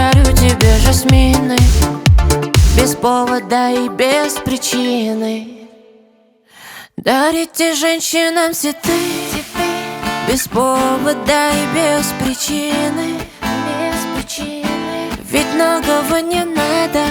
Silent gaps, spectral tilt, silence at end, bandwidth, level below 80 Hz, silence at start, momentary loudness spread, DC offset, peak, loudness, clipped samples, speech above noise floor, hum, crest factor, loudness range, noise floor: none; -4.5 dB/octave; 0 s; over 20 kHz; -20 dBFS; 0 s; 10 LU; under 0.1%; 0 dBFS; -15 LUFS; under 0.1%; 37 dB; none; 14 dB; 6 LU; -51 dBFS